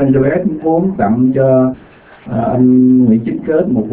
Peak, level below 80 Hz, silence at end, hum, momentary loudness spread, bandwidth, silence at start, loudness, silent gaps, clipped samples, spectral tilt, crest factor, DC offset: 0 dBFS; -42 dBFS; 0 s; none; 8 LU; 3.3 kHz; 0 s; -12 LUFS; none; under 0.1%; -13.5 dB/octave; 12 dB; under 0.1%